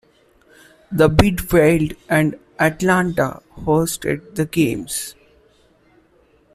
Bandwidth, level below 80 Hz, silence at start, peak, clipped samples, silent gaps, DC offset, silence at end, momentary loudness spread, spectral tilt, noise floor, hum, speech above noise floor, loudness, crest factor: 16 kHz; -38 dBFS; 0.9 s; -2 dBFS; under 0.1%; none; under 0.1%; 1.45 s; 11 LU; -5.5 dB/octave; -56 dBFS; none; 38 dB; -18 LUFS; 18 dB